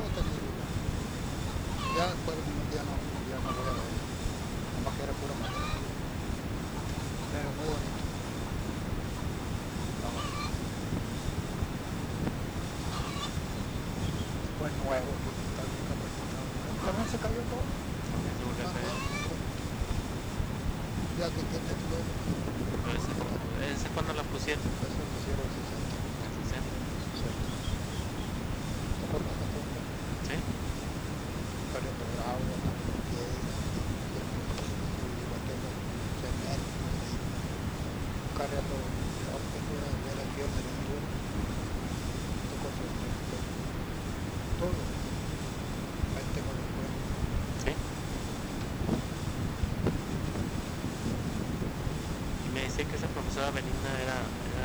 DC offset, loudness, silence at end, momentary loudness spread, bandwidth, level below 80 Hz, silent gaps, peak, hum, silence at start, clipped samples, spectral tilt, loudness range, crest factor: under 0.1%; -35 LUFS; 0 s; 3 LU; over 20 kHz; -40 dBFS; none; -12 dBFS; none; 0 s; under 0.1%; -5.5 dB/octave; 2 LU; 22 dB